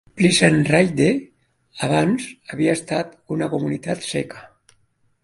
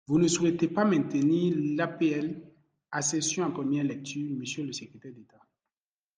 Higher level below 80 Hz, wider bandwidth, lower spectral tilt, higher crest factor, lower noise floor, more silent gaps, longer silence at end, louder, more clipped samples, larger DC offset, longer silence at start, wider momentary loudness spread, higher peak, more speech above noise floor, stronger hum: first, -56 dBFS vs -70 dBFS; about the same, 11.5 kHz vs 10.5 kHz; about the same, -5 dB/octave vs -5 dB/octave; about the same, 20 dB vs 18 dB; second, -63 dBFS vs under -90 dBFS; neither; second, 0.75 s vs 0.95 s; first, -20 LUFS vs -28 LUFS; neither; neither; about the same, 0.15 s vs 0.1 s; about the same, 12 LU vs 12 LU; first, 0 dBFS vs -12 dBFS; second, 43 dB vs over 62 dB; neither